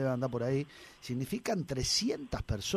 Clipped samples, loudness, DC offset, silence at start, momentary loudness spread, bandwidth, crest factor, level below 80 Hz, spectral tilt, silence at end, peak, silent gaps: under 0.1%; -34 LUFS; under 0.1%; 0 s; 10 LU; 15.5 kHz; 16 dB; -50 dBFS; -4.5 dB/octave; 0 s; -18 dBFS; none